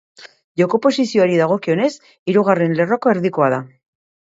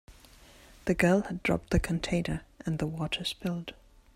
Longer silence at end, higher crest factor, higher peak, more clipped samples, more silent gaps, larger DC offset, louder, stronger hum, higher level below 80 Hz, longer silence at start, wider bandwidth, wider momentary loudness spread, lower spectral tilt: first, 0.65 s vs 0.4 s; about the same, 16 dB vs 20 dB; first, 0 dBFS vs -10 dBFS; neither; first, 0.44-0.55 s, 2.19-2.26 s vs none; neither; first, -17 LUFS vs -30 LUFS; neither; second, -64 dBFS vs -44 dBFS; about the same, 0.2 s vs 0.1 s; second, 8 kHz vs 15 kHz; second, 6 LU vs 11 LU; about the same, -6.5 dB/octave vs -6 dB/octave